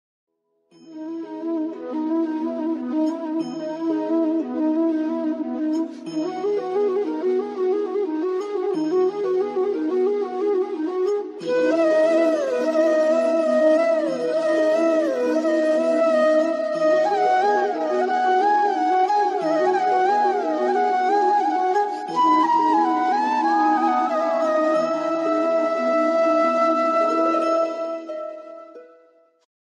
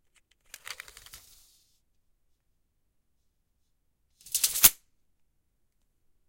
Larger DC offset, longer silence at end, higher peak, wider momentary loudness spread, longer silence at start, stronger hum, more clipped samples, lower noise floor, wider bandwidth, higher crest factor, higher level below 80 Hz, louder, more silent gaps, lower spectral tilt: neither; second, 0.85 s vs 1.55 s; second, -8 dBFS vs -2 dBFS; second, 8 LU vs 26 LU; first, 0.85 s vs 0.7 s; neither; neither; second, -59 dBFS vs -74 dBFS; second, 10 kHz vs 17 kHz; second, 12 dB vs 34 dB; second, under -90 dBFS vs -60 dBFS; about the same, -21 LUFS vs -22 LUFS; neither; first, -5 dB/octave vs 1.5 dB/octave